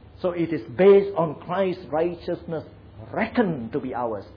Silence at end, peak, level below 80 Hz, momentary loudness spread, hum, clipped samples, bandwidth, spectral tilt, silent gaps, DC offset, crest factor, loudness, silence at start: 0 s; -6 dBFS; -54 dBFS; 15 LU; none; under 0.1%; 5.2 kHz; -10 dB/octave; none; under 0.1%; 18 dB; -24 LUFS; 0.15 s